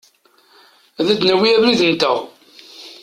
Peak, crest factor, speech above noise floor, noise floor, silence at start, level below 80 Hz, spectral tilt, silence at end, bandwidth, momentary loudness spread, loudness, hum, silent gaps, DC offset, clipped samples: -2 dBFS; 16 dB; 39 dB; -54 dBFS; 1 s; -60 dBFS; -4.5 dB/octave; 0.1 s; 14 kHz; 23 LU; -15 LUFS; none; none; under 0.1%; under 0.1%